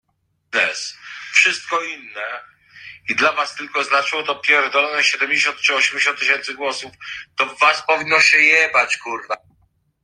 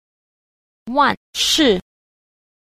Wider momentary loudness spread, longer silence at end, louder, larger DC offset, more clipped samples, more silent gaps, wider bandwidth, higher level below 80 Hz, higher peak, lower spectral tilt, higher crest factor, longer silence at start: first, 16 LU vs 8 LU; second, 0.65 s vs 0.8 s; about the same, -16 LUFS vs -17 LUFS; neither; neither; second, none vs 1.17-1.33 s; second, 11 kHz vs 15.5 kHz; second, -68 dBFS vs -48 dBFS; first, 0 dBFS vs -4 dBFS; second, -0.5 dB/octave vs -2.5 dB/octave; about the same, 18 dB vs 18 dB; second, 0.5 s vs 0.85 s